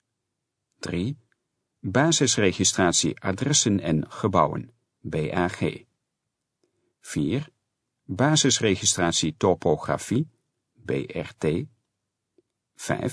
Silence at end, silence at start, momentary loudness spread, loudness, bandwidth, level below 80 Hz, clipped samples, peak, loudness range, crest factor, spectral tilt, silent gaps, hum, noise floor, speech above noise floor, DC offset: 0 s; 0.8 s; 16 LU; -24 LUFS; 11 kHz; -54 dBFS; under 0.1%; -4 dBFS; 9 LU; 22 dB; -4 dB/octave; none; none; -82 dBFS; 58 dB; under 0.1%